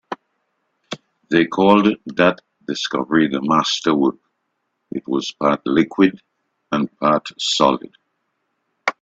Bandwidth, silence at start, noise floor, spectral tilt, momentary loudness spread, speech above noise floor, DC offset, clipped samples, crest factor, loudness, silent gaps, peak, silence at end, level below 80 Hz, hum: 8 kHz; 0.1 s; -73 dBFS; -4.5 dB/octave; 16 LU; 56 dB; under 0.1%; under 0.1%; 20 dB; -18 LUFS; none; 0 dBFS; 0.1 s; -60 dBFS; none